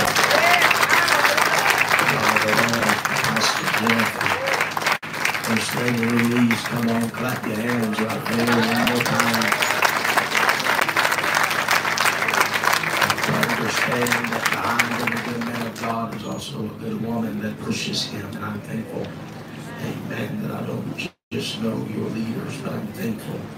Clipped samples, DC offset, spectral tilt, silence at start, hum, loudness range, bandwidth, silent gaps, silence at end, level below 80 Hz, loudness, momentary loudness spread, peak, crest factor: under 0.1%; under 0.1%; -3.5 dB/octave; 0 s; none; 11 LU; 16.5 kHz; 21.23-21.31 s; 0 s; -58 dBFS; -20 LUFS; 13 LU; 0 dBFS; 22 dB